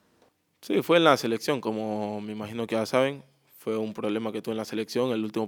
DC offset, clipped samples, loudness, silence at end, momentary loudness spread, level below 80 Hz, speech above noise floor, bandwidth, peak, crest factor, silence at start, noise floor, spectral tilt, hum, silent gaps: under 0.1%; under 0.1%; -27 LUFS; 0 s; 13 LU; -76 dBFS; 39 dB; over 20 kHz; -4 dBFS; 24 dB; 0.6 s; -66 dBFS; -5 dB/octave; none; none